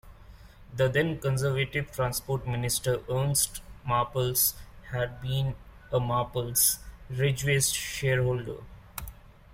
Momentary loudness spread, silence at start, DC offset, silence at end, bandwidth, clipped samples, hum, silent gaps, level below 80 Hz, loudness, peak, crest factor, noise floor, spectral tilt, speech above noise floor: 16 LU; 0.05 s; under 0.1%; 0 s; 16.5 kHz; under 0.1%; none; none; -48 dBFS; -28 LUFS; -10 dBFS; 20 dB; -50 dBFS; -4 dB/octave; 22 dB